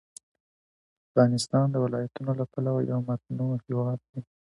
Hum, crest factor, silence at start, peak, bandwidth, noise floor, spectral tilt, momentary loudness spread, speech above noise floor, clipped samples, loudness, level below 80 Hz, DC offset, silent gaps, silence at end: none; 20 dB; 1.15 s; -8 dBFS; 11.5 kHz; under -90 dBFS; -7 dB/octave; 9 LU; over 63 dB; under 0.1%; -28 LUFS; -68 dBFS; under 0.1%; 4.09-4.13 s; 0.3 s